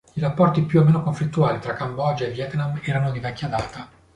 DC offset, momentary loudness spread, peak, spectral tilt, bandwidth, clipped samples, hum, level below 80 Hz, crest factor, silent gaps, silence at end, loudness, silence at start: under 0.1%; 10 LU; -4 dBFS; -8 dB/octave; 9.6 kHz; under 0.1%; none; -50 dBFS; 18 dB; none; 0.3 s; -22 LUFS; 0.15 s